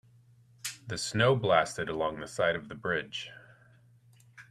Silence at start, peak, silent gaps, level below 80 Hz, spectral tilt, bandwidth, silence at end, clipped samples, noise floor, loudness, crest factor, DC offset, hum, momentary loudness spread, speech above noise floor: 0.65 s; -8 dBFS; none; -62 dBFS; -4.5 dB/octave; 14 kHz; 0.1 s; under 0.1%; -60 dBFS; -30 LUFS; 24 dB; under 0.1%; none; 14 LU; 31 dB